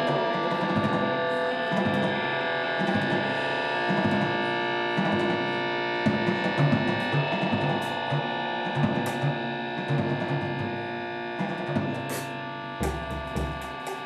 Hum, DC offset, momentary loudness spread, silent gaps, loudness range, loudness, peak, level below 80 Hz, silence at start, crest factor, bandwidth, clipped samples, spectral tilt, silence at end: none; under 0.1%; 7 LU; none; 5 LU; -27 LUFS; -10 dBFS; -48 dBFS; 0 s; 16 dB; 14 kHz; under 0.1%; -6 dB/octave; 0 s